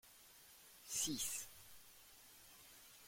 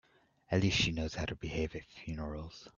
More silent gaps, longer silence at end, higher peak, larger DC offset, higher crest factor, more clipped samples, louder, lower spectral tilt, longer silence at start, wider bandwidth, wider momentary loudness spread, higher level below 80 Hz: neither; about the same, 0 s vs 0.05 s; second, -30 dBFS vs -16 dBFS; neither; about the same, 22 dB vs 20 dB; neither; second, -43 LUFS vs -35 LUFS; second, -1 dB/octave vs -5 dB/octave; second, 0.05 s vs 0.5 s; first, 16.5 kHz vs 7.4 kHz; first, 21 LU vs 14 LU; second, -76 dBFS vs -50 dBFS